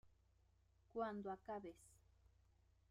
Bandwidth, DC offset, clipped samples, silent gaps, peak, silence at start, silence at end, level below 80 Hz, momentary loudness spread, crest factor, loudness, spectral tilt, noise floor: 15.5 kHz; under 0.1%; under 0.1%; none; -34 dBFS; 0.05 s; 0.95 s; -76 dBFS; 12 LU; 20 dB; -50 LUFS; -6.5 dB/octave; -77 dBFS